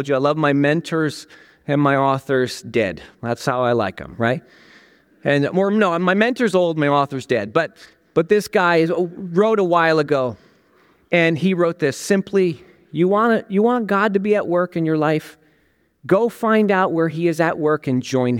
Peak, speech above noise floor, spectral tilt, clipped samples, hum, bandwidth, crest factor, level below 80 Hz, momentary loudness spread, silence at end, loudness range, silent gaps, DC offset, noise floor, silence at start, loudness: -2 dBFS; 43 dB; -6.5 dB/octave; under 0.1%; none; 17 kHz; 16 dB; -60 dBFS; 7 LU; 0 s; 2 LU; none; under 0.1%; -61 dBFS; 0 s; -19 LUFS